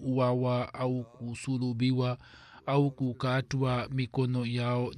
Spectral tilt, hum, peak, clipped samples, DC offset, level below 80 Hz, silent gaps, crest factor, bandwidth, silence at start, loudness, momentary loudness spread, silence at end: -7.5 dB/octave; none; -14 dBFS; under 0.1%; under 0.1%; -62 dBFS; none; 16 dB; 10 kHz; 0 s; -31 LUFS; 7 LU; 0 s